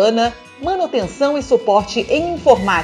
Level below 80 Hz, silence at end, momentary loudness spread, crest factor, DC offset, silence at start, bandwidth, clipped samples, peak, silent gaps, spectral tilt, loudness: -40 dBFS; 0 s; 7 LU; 16 dB; under 0.1%; 0 s; 11 kHz; under 0.1%; 0 dBFS; none; -4.5 dB/octave; -17 LUFS